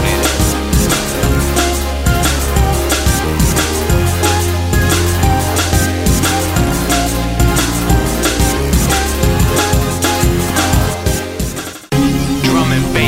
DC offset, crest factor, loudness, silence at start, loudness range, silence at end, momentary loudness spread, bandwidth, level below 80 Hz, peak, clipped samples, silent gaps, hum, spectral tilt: under 0.1%; 12 dB; -14 LUFS; 0 s; 1 LU; 0 s; 2 LU; 16.5 kHz; -18 dBFS; 0 dBFS; under 0.1%; none; none; -4.5 dB/octave